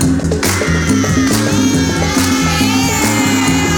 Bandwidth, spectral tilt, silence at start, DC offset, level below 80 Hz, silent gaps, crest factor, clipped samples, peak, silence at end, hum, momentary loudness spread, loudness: 19 kHz; -4 dB/octave; 0 s; under 0.1%; -28 dBFS; none; 12 dB; under 0.1%; 0 dBFS; 0 s; none; 2 LU; -13 LUFS